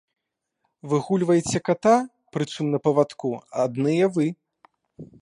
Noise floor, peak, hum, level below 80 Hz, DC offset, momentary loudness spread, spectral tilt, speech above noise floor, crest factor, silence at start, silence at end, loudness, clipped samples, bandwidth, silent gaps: -76 dBFS; -6 dBFS; none; -62 dBFS; under 0.1%; 10 LU; -6 dB/octave; 54 dB; 18 dB; 0.85 s; 0.15 s; -23 LUFS; under 0.1%; 11.5 kHz; none